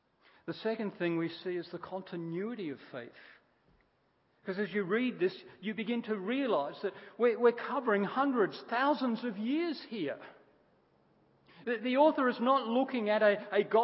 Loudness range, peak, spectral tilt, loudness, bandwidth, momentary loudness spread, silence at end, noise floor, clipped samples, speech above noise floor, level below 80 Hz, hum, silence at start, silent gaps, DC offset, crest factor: 8 LU; -14 dBFS; -4 dB/octave; -32 LUFS; 5.6 kHz; 14 LU; 0 s; -73 dBFS; under 0.1%; 41 dB; -84 dBFS; none; 0.45 s; none; under 0.1%; 20 dB